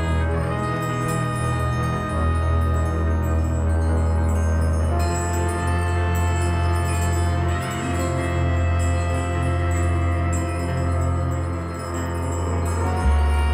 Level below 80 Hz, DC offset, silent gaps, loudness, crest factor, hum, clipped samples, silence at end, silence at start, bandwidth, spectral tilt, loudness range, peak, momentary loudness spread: -26 dBFS; under 0.1%; none; -22 LUFS; 10 dB; none; under 0.1%; 0 s; 0 s; 14.5 kHz; -6.5 dB/octave; 2 LU; -10 dBFS; 3 LU